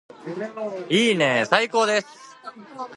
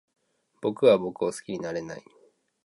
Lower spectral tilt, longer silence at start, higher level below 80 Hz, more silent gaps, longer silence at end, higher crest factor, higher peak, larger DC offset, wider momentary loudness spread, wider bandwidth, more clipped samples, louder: second, -4 dB/octave vs -5.5 dB/octave; second, 0.2 s vs 0.6 s; second, -74 dBFS vs -68 dBFS; neither; second, 0 s vs 0.65 s; about the same, 22 dB vs 20 dB; first, -2 dBFS vs -8 dBFS; neither; first, 22 LU vs 16 LU; about the same, 11.5 kHz vs 11.5 kHz; neither; first, -21 LUFS vs -26 LUFS